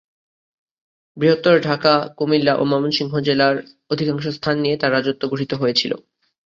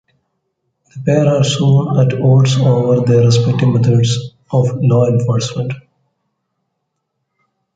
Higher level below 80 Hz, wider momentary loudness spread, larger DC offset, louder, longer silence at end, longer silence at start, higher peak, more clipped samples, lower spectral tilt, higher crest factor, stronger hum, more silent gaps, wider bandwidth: second, -60 dBFS vs -48 dBFS; about the same, 7 LU vs 9 LU; neither; second, -19 LUFS vs -13 LUFS; second, 0.5 s vs 1.95 s; first, 1.15 s vs 0.95 s; about the same, -2 dBFS vs 0 dBFS; neither; about the same, -6 dB/octave vs -7 dB/octave; about the same, 18 dB vs 14 dB; neither; neither; second, 7.6 kHz vs 9 kHz